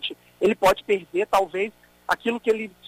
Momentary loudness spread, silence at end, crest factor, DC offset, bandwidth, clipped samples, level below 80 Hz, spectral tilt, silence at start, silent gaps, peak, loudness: 10 LU; 0.2 s; 16 dB; under 0.1%; 15.5 kHz; under 0.1%; -54 dBFS; -4 dB/octave; 0 s; none; -8 dBFS; -24 LUFS